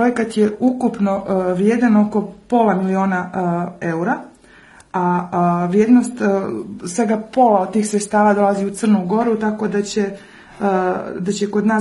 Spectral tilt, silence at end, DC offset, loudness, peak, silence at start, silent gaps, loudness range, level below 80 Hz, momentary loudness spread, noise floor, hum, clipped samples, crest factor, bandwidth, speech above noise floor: -6.5 dB/octave; 0 s; under 0.1%; -18 LUFS; -2 dBFS; 0 s; none; 3 LU; -56 dBFS; 9 LU; -45 dBFS; none; under 0.1%; 16 dB; 11.5 kHz; 29 dB